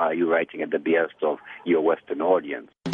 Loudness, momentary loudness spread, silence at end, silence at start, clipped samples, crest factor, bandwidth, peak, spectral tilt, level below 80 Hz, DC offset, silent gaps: -24 LUFS; 8 LU; 0 s; 0 s; under 0.1%; 16 dB; 6.8 kHz; -8 dBFS; -7.5 dB/octave; -74 dBFS; under 0.1%; none